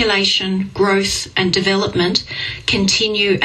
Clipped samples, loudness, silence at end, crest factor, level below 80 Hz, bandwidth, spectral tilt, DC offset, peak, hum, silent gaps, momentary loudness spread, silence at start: under 0.1%; -16 LUFS; 0 s; 16 dB; -42 dBFS; 14 kHz; -3.5 dB/octave; under 0.1%; 0 dBFS; none; none; 5 LU; 0 s